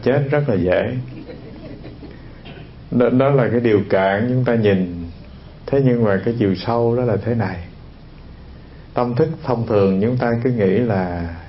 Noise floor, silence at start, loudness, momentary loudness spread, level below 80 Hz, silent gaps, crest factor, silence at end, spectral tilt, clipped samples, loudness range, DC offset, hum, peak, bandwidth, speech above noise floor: -39 dBFS; 0 s; -18 LUFS; 20 LU; -42 dBFS; none; 16 dB; 0 s; -12.5 dB/octave; under 0.1%; 4 LU; under 0.1%; none; -2 dBFS; 5.8 kHz; 22 dB